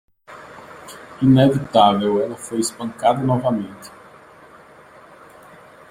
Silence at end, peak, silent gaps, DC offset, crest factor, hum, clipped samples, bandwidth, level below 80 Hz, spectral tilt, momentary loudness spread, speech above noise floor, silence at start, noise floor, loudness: 2 s; -2 dBFS; none; under 0.1%; 18 dB; none; under 0.1%; 15.5 kHz; -54 dBFS; -6 dB/octave; 25 LU; 28 dB; 0.3 s; -45 dBFS; -18 LUFS